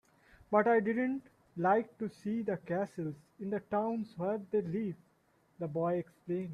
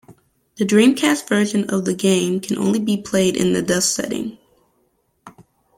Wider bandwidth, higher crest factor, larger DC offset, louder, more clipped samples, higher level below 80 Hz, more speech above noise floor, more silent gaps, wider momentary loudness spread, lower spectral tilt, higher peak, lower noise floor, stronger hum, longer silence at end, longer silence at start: second, 11 kHz vs 16.5 kHz; about the same, 20 dB vs 18 dB; neither; second, -35 LUFS vs -18 LUFS; neither; second, -74 dBFS vs -56 dBFS; second, 37 dB vs 47 dB; neither; first, 12 LU vs 9 LU; first, -9 dB/octave vs -4.5 dB/octave; second, -16 dBFS vs -2 dBFS; first, -71 dBFS vs -65 dBFS; neither; second, 0 s vs 0.5 s; first, 0.5 s vs 0.1 s